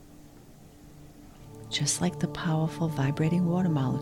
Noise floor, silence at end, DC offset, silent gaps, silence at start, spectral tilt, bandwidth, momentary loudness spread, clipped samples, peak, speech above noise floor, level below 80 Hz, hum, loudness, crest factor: -51 dBFS; 0 s; under 0.1%; none; 0 s; -5 dB/octave; 15.5 kHz; 7 LU; under 0.1%; -12 dBFS; 24 dB; -56 dBFS; none; -28 LUFS; 16 dB